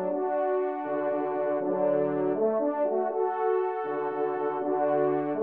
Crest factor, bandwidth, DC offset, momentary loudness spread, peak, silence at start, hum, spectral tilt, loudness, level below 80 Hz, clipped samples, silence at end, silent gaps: 12 dB; 3.7 kHz; under 0.1%; 4 LU; -16 dBFS; 0 s; none; -7 dB/octave; -28 LUFS; -82 dBFS; under 0.1%; 0 s; none